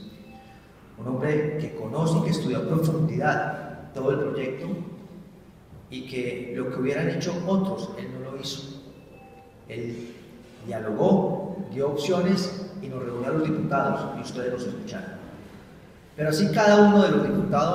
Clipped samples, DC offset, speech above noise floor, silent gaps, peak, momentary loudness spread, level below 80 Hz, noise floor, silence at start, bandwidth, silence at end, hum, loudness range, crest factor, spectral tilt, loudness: under 0.1%; under 0.1%; 25 dB; none; -6 dBFS; 19 LU; -56 dBFS; -49 dBFS; 0 s; 15.5 kHz; 0 s; none; 8 LU; 20 dB; -6.5 dB/octave; -25 LUFS